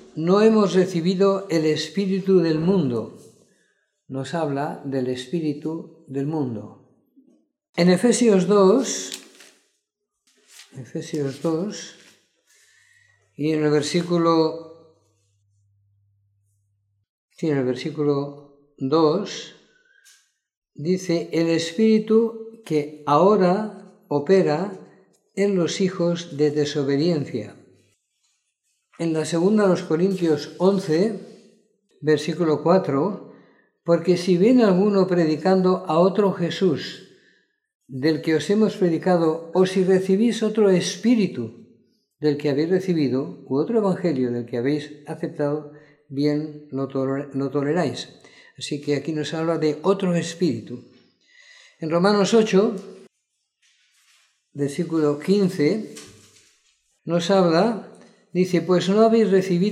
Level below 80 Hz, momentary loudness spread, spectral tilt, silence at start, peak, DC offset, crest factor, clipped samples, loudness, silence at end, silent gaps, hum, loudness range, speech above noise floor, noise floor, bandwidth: -72 dBFS; 15 LU; -6 dB/octave; 0.15 s; -4 dBFS; under 0.1%; 18 dB; under 0.1%; -21 LUFS; 0 s; 7.69-7.73 s, 17.09-17.28 s, 20.57-20.62 s, 37.75-37.80 s; none; 8 LU; 58 dB; -79 dBFS; 12.5 kHz